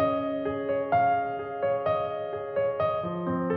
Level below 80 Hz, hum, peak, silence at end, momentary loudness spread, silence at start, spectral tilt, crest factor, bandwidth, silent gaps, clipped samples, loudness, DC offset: -60 dBFS; none; -14 dBFS; 0 s; 7 LU; 0 s; -6 dB/octave; 14 dB; 5.2 kHz; none; under 0.1%; -28 LUFS; under 0.1%